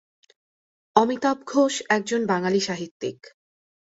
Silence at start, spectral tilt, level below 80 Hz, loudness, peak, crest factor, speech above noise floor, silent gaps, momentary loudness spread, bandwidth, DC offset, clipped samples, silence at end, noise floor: 0.95 s; -4 dB/octave; -68 dBFS; -23 LUFS; -2 dBFS; 24 dB; over 67 dB; 2.91-3.00 s; 10 LU; 8 kHz; under 0.1%; under 0.1%; 0.85 s; under -90 dBFS